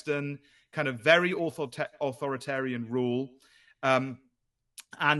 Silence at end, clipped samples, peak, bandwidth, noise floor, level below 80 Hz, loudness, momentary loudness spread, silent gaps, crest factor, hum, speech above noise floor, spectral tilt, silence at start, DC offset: 0 s; under 0.1%; -6 dBFS; 12.5 kHz; -78 dBFS; -76 dBFS; -29 LUFS; 17 LU; none; 24 dB; none; 49 dB; -5.5 dB/octave; 0.05 s; under 0.1%